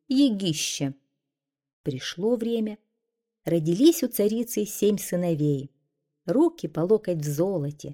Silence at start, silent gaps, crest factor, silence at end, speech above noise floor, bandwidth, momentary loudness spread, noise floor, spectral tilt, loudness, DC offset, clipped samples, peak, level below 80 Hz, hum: 0.1 s; 1.73-1.84 s; 18 dB; 0 s; 63 dB; 18.5 kHz; 12 LU; -87 dBFS; -5.5 dB/octave; -25 LUFS; under 0.1%; under 0.1%; -8 dBFS; -64 dBFS; none